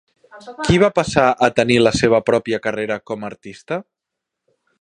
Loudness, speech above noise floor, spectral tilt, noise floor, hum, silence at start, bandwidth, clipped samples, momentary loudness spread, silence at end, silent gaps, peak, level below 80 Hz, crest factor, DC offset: -17 LUFS; 64 dB; -5 dB/octave; -82 dBFS; none; 0.35 s; 11 kHz; under 0.1%; 14 LU; 1 s; none; 0 dBFS; -42 dBFS; 18 dB; under 0.1%